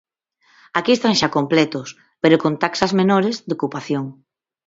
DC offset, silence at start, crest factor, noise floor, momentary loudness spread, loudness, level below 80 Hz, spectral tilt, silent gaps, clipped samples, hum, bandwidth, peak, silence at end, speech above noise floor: under 0.1%; 0.75 s; 20 dB; -60 dBFS; 9 LU; -18 LUFS; -60 dBFS; -5 dB/octave; none; under 0.1%; none; 7.8 kHz; 0 dBFS; 0.55 s; 42 dB